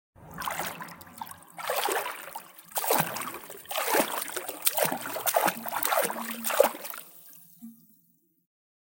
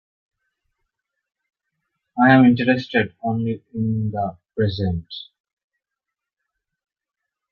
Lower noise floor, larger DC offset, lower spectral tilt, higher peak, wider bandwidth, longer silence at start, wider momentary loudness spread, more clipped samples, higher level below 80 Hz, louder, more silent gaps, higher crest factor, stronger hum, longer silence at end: second, -67 dBFS vs -85 dBFS; neither; second, -2 dB/octave vs -9 dB/octave; about the same, -4 dBFS vs -2 dBFS; first, 17.5 kHz vs 5.8 kHz; second, 0.2 s vs 2.15 s; first, 19 LU vs 16 LU; neither; second, -72 dBFS vs -56 dBFS; second, -28 LUFS vs -20 LUFS; neither; first, 28 dB vs 22 dB; neither; second, 1.05 s vs 2.3 s